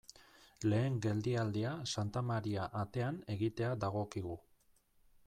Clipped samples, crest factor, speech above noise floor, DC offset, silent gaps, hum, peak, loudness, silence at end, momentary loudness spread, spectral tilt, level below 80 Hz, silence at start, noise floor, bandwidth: under 0.1%; 14 dB; 34 dB; under 0.1%; none; none; -24 dBFS; -38 LUFS; 0.85 s; 7 LU; -6.5 dB/octave; -66 dBFS; 0.2 s; -71 dBFS; 12 kHz